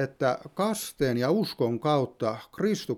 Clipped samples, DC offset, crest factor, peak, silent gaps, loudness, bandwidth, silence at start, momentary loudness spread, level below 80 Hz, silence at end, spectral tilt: under 0.1%; under 0.1%; 16 dB; -10 dBFS; none; -28 LUFS; 18 kHz; 0 s; 5 LU; -60 dBFS; 0 s; -5.5 dB/octave